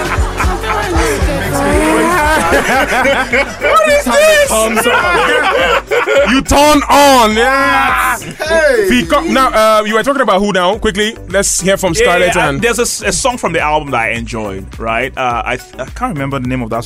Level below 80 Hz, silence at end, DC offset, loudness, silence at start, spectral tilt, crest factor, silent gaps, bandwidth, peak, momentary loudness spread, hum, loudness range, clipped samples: -26 dBFS; 0 s; under 0.1%; -11 LUFS; 0 s; -3.5 dB/octave; 10 dB; none; 16 kHz; 0 dBFS; 9 LU; none; 5 LU; under 0.1%